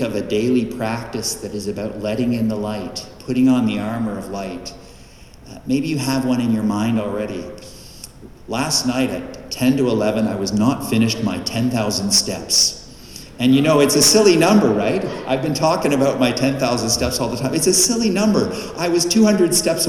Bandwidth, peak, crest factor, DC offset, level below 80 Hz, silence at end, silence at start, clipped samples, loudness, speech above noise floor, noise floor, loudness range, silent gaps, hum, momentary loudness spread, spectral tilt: 19 kHz; -2 dBFS; 16 dB; under 0.1%; -44 dBFS; 0 s; 0 s; under 0.1%; -18 LUFS; 24 dB; -42 dBFS; 7 LU; none; none; 15 LU; -4 dB/octave